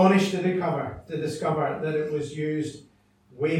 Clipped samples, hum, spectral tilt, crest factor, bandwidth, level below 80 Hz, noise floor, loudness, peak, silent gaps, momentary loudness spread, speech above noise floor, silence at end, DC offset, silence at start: under 0.1%; none; -6.5 dB/octave; 18 dB; 13.5 kHz; -60 dBFS; -57 dBFS; -27 LUFS; -8 dBFS; none; 9 LU; 31 dB; 0 s; under 0.1%; 0 s